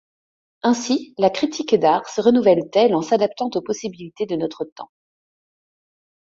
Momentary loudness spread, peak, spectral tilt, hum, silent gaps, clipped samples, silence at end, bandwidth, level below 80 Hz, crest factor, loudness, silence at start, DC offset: 12 LU; -2 dBFS; -5 dB/octave; none; 4.72-4.76 s; under 0.1%; 1.35 s; 7.8 kHz; -64 dBFS; 18 dB; -20 LUFS; 0.65 s; under 0.1%